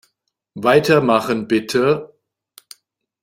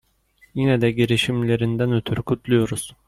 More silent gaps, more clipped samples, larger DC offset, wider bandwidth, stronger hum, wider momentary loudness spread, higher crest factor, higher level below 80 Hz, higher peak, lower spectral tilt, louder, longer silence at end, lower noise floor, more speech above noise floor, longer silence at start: neither; neither; neither; first, 16 kHz vs 14.5 kHz; neither; about the same, 7 LU vs 6 LU; about the same, 18 dB vs 16 dB; second, -58 dBFS vs -50 dBFS; first, -2 dBFS vs -6 dBFS; about the same, -5.5 dB/octave vs -6 dB/octave; first, -17 LUFS vs -21 LUFS; first, 1.15 s vs 0.15 s; first, -70 dBFS vs -58 dBFS; first, 55 dB vs 38 dB; about the same, 0.55 s vs 0.55 s